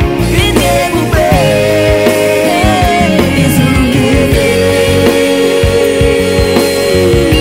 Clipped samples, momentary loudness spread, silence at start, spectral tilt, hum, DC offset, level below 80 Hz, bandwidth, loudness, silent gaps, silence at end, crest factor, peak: 0.2%; 1 LU; 0 s; -5 dB/octave; none; under 0.1%; -20 dBFS; 16.5 kHz; -9 LUFS; none; 0 s; 8 dB; 0 dBFS